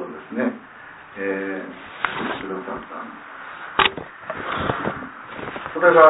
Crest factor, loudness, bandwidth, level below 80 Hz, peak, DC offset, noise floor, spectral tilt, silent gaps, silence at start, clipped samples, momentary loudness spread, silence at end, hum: 22 dB; -25 LUFS; 4 kHz; -54 dBFS; 0 dBFS; under 0.1%; -42 dBFS; -8 dB/octave; none; 0 s; under 0.1%; 17 LU; 0 s; none